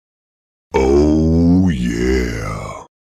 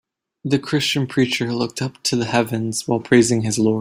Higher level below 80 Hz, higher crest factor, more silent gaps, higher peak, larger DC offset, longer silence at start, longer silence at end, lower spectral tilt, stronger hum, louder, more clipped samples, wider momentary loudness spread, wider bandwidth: first, -26 dBFS vs -56 dBFS; second, 12 dB vs 18 dB; neither; about the same, -4 dBFS vs -2 dBFS; neither; first, 0.75 s vs 0.45 s; first, 0.2 s vs 0 s; first, -7.5 dB/octave vs -4.5 dB/octave; neither; first, -15 LUFS vs -19 LUFS; neither; first, 13 LU vs 8 LU; second, 13.5 kHz vs 16 kHz